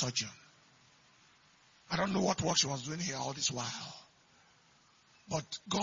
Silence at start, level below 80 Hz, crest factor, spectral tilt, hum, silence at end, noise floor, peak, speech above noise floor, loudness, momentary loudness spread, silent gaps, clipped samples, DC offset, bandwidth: 0 s; -66 dBFS; 24 dB; -3 dB/octave; none; 0 s; -66 dBFS; -14 dBFS; 31 dB; -34 LUFS; 13 LU; none; under 0.1%; under 0.1%; 7.6 kHz